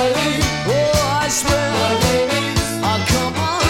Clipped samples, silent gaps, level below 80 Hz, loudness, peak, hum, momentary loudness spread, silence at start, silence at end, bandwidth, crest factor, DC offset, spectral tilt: under 0.1%; none; -32 dBFS; -17 LUFS; -2 dBFS; none; 3 LU; 0 s; 0 s; 18 kHz; 14 dB; under 0.1%; -4 dB/octave